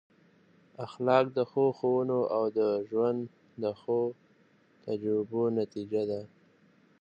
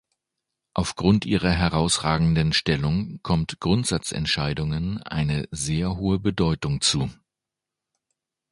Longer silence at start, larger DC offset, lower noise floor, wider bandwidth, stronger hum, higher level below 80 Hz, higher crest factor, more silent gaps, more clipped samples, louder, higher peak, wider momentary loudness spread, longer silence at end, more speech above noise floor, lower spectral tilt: about the same, 0.8 s vs 0.75 s; neither; second, -64 dBFS vs -87 dBFS; second, 7.4 kHz vs 11.5 kHz; neither; second, -76 dBFS vs -40 dBFS; about the same, 22 dB vs 20 dB; neither; neither; second, -30 LUFS vs -23 LUFS; second, -10 dBFS vs -4 dBFS; first, 11 LU vs 6 LU; second, 0.75 s vs 1.4 s; second, 35 dB vs 64 dB; first, -8.5 dB/octave vs -5 dB/octave